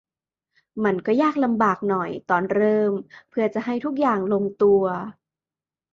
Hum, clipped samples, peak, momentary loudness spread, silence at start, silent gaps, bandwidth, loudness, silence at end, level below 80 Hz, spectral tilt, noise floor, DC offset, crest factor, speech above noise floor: none; under 0.1%; -6 dBFS; 9 LU; 0.75 s; none; 7 kHz; -22 LUFS; 0.8 s; -66 dBFS; -8 dB/octave; under -90 dBFS; under 0.1%; 16 dB; over 69 dB